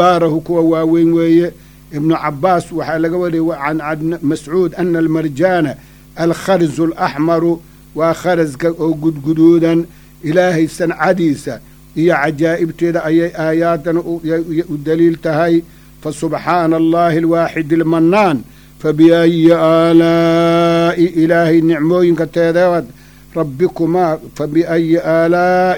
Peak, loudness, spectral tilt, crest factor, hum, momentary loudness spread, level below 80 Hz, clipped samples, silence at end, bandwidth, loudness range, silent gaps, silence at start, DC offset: 0 dBFS; -13 LUFS; -7 dB/octave; 14 dB; none; 9 LU; -44 dBFS; under 0.1%; 0 s; 18.5 kHz; 5 LU; none; 0 s; under 0.1%